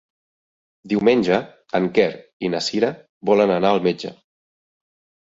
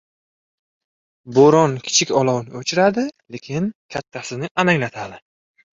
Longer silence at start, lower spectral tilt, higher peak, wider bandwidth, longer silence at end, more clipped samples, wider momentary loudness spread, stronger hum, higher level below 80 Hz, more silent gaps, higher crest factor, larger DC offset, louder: second, 0.85 s vs 1.25 s; first, -5.5 dB/octave vs -4 dB/octave; about the same, -4 dBFS vs -2 dBFS; about the same, 8 kHz vs 7.8 kHz; first, 1.1 s vs 0.6 s; neither; second, 10 LU vs 17 LU; neither; about the same, -60 dBFS vs -58 dBFS; about the same, 2.33-2.40 s, 3.09-3.21 s vs 3.75-3.89 s, 4.51-4.55 s; about the same, 18 dB vs 18 dB; neither; about the same, -20 LUFS vs -18 LUFS